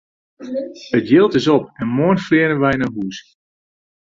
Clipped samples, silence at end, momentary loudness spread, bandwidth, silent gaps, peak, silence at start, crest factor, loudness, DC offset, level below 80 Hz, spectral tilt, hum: under 0.1%; 0.95 s; 14 LU; 7.6 kHz; none; -2 dBFS; 0.4 s; 16 dB; -17 LUFS; under 0.1%; -52 dBFS; -7 dB/octave; none